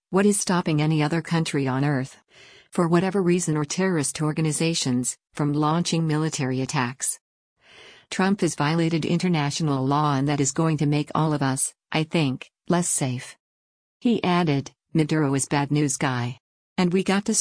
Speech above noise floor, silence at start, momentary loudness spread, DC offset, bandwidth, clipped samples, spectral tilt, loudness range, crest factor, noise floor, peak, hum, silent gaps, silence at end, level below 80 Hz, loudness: 27 dB; 0.1 s; 6 LU; under 0.1%; 10.5 kHz; under 0.1%; -5 dB/octave; 2 LU; 16 dB; -50 dBFS; -8 dBFS; none; 7.21-7.56 s, 13.40-14.00 s, 16.40-16.76 s; 0 s; -60 dBFS; -23 LUFS